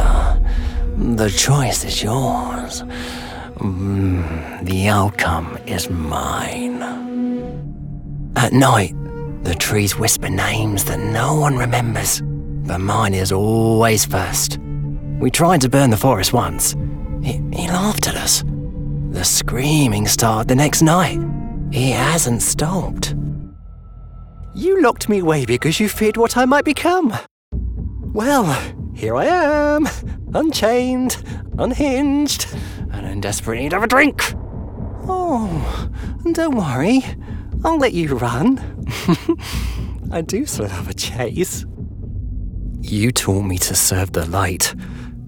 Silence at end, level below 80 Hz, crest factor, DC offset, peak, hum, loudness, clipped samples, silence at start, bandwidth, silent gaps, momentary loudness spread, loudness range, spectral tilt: 0 s; -28 dBFS; 16 dB; under 0.1%; -2 dBFS; none; -18 LUFS; under 0.1%; 0 s; over 20 kHz; 27.31-27.51 s; 13 LU; 5 LU; -4.5 dB/octave